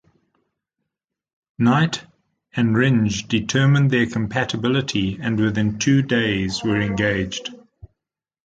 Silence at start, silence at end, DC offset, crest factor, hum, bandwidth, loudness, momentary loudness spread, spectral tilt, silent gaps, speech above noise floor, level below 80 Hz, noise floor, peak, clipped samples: 1.6 s; 0.9 s; under 0.1%; 16 dB; none; 9 kHz; -20 LUFS; 6 LU; -5.5 dB/octave; none; 68 dB; -48 dBFS; -87 dBFS; -4 dBFS; under 0.1%